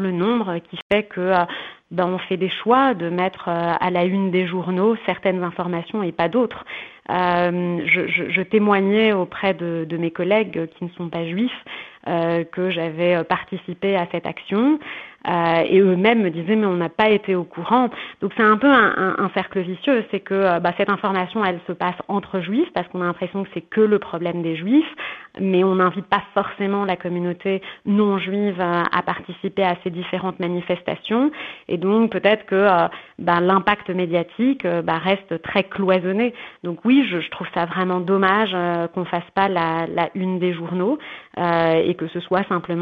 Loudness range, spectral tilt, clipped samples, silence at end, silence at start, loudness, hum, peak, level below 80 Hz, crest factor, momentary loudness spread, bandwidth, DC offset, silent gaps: 4 LU; -9 dB/octave; under 0.1%; 0 s; 0 s; -20 LUFS; none; -2 dBFS; -60 dBFS; 18 dB; 9 LU; 5.2 kHz; under 0.1%; 0.82-0.90 s